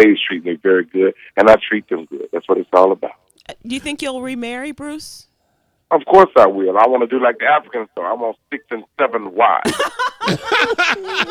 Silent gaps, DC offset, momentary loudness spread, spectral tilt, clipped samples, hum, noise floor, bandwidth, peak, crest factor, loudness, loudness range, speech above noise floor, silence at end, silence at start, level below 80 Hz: none; under 0.1%; 16 LU; -4.5 dB/octave; 0.1%; none; -64 dBFS; 15 kHz; 0 dBFS; 16 dB; -16 LUFS; 6 LU; 48 dB; 0 s; 0 s; -54 dBFS